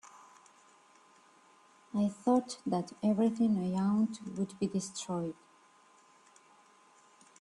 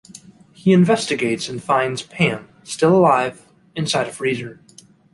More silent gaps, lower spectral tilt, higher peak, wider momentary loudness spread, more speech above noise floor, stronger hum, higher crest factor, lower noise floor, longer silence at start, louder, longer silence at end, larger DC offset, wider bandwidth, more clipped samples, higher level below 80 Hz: neither; about the same, -6.5 dB/octave vs -5.5 dB/octave; second, -16 dBFS vs -2 dBFS; second, 9 LU vs 13 LU; first, 32 dB vs 26 dB; neither; about the same, 18 dB vs 18 dB; first, -63 dBFS vs -44 dBFS; about the same, 0.05 s vs 0.15 s; second, -33 LUFS vs -19 LUFS; first, 2.1 s vs 0.6 s; neither; about the same, 11.5 kHz vs 11.5 kHz; neither; second, -74 dBFS vs -58 dBFS